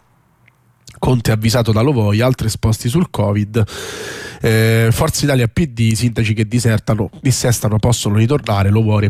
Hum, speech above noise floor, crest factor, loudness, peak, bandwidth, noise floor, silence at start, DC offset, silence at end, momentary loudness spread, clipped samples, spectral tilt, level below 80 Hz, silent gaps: none; 39 dB; 12 dB; -15 LUFS; -4 dBFS; 15.5 kHz; -53 dBFS; 0.85 s; under 0.1%; 0 s; 5 LU; under 0.1%; -5.5 dB/octave; -36 dBFS; none